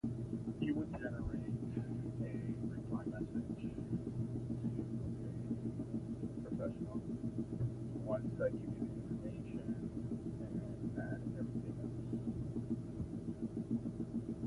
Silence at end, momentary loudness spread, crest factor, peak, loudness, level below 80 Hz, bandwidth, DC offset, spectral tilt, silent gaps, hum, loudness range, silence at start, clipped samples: 0 s; 4 LU; 16 dB; -26 dBFS; -43 LUFS; -56 dBFS; 11.5 kHz; under 0.1%; -9.5 dB/octave; none; none; 1 LU; 0.05 s; under 0.1%